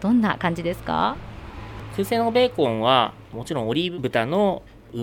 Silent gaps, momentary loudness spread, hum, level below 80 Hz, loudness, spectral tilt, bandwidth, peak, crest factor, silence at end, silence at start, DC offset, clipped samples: none; 17 LU; none; -46 dBFS; -23 LUFS; -6 dB/octave; 17.5 kHz; -4 dBFS; 18 dB; 0 s; 0 s; under 0.1%; under 0.1%